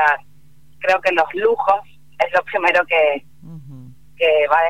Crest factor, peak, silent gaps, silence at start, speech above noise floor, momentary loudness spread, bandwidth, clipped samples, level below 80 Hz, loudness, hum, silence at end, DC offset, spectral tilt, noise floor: 18 dB; 0 dBFS; none; 0 s; 36 dB; 11 LU; 13.5 kHz; under 0.1%; -58 dBFS; -18 LUFS; none; 0 s; 0.8%; -4.5 dB/octave; -53 dBFS